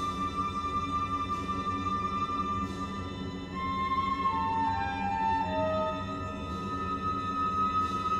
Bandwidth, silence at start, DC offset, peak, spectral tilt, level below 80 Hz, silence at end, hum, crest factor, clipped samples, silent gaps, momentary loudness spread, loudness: 12 kHz; 0 s; under 0.1%; -18 dBFS; -6 dB/octave; -48 dBFS; 0 s; none; 14 dB; under 0.1%; none; 7 LU; -31 LUFS